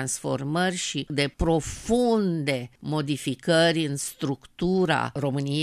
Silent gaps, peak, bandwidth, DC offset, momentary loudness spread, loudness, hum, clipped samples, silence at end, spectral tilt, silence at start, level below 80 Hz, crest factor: none; -8 dBFS; 14.5 kHz; under 0.1%; 8 LU; -25 LUFS; none; under 0.1%; 0 s; -4.5 dB/octave; 0 s; -46 dBFS; 16 dB